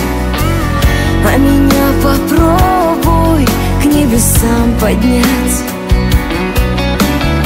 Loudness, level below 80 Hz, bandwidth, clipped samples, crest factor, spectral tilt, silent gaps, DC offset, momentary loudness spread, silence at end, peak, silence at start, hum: -11 LUFS; -16 dBFS; 16.5 kHz; under 0.1%; 10 dB; -5.5 dB/octave; none; under 0.1%; 5 LU; 0 s; 0 dBFS; 0 s; none